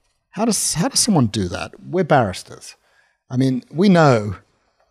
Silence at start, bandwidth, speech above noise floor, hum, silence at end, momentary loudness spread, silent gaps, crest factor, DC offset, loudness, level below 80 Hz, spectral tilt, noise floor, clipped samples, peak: 0.35 s; 15.5 kHz; 43 dB; none; 0.55 s; 19 LU; none; 16 dB; under 0.1%; -18 LUFS; -52 dBFS; -4.5 dB/octave; -60 dBFS; under 0.1%; -4 dBFS